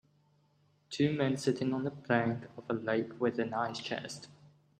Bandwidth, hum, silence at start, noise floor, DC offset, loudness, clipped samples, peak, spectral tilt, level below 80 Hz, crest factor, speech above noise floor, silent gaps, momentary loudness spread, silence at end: 12 kHz; none; 0.9 s; -70 dBFS; under 0.1%; -34 LUFS; under 0.1%; -12 dBFS; -6 dB/octave; -74 dBFS; 22 dB; 37 dB; none; 10 LU; 0.35 s